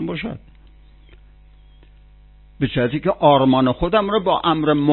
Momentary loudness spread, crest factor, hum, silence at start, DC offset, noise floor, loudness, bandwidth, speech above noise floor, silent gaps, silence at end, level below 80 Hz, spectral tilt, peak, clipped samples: 13 LU; 18 dB; 50 Hz at -45 dBFS; 0 s; under 0.1%; -47 dBFS; -18 LUFS; 4.3 kHz; 29 dB; none; 0 s; -42 dBFS; -11.5 dB/octave; -2 dBFS; under 0.1%